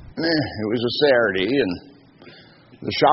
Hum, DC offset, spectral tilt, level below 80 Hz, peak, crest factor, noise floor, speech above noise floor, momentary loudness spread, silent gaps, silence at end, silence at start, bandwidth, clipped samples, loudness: none; under 0.1%; -3 dB/octave; -52 dBFS; -2 dBFS; 18 dB; -48 dBFS; 28 dB; 10 LU; none; 0 s; 0 s; 6 kHz; under 0.1%; -20 LUFS